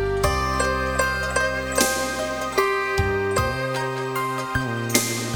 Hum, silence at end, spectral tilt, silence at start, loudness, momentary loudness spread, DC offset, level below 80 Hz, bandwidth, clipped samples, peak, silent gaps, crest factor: none; 0 s; -3.5 dB/octave; 0 s; -23 LUFS; 4 LU; under 0.1%; -36 dBFS; 19.5 kHz; under 0.1%; -2 dBFS; none; 20 dB